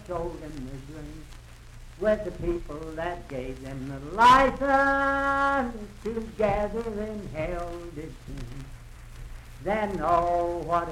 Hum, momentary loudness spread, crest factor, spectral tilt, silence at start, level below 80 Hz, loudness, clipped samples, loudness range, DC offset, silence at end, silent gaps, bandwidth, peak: none; 20 LU; 20 dB; -5.5 dB/octave; 0 s; -42 dBFS; -26 LUFS; under 0.1%; 10 LU; under 0.1%; 0 s; none; 16 kHz; -8 dBFS